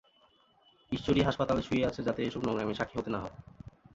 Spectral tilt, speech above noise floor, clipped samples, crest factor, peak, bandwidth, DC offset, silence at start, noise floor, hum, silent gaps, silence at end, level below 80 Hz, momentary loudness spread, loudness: -6.5 dB/octave; 35 dB; under 0.1%; 20 dB; -12 dBFS; 7.8 kHz; under 0.1%; 0.9 s; -66 dBFS; none; none; 0.25 s; -52 dBFS; 17 LU; -32 LUFS